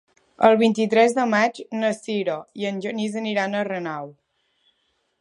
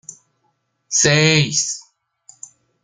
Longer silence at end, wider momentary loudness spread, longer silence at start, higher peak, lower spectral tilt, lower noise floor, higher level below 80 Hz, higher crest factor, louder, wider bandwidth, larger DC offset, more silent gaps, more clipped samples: about the same, 1.1 s vs 1.05 s; about the same, 11 LU vs 11 LU; first, 0.4 s vs 0.1 s; about the same, 0 dBFS vs -2 dBFS; first, -5 dB/octave vs -3 dB/octave; about the same, -70 dBFS vs -68 dBFS; second, -72 dBFS vs -56 dBFS; about the same, 22 dB vs 20 dB; second, -22 LUFS vs -15 LUFS; about the same, 11 kHz vs 10 kHz; neither; neither; neither